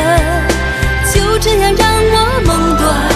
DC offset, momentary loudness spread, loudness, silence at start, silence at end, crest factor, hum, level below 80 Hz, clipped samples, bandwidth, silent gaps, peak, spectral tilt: under 0.1%; 4 LU; -12 LUFS; 0 s; 0 s; 12 dB; none; -18 dBFS; under 0.1%; 14 kHz; none; 0 dBFS; -4.5 dB/octave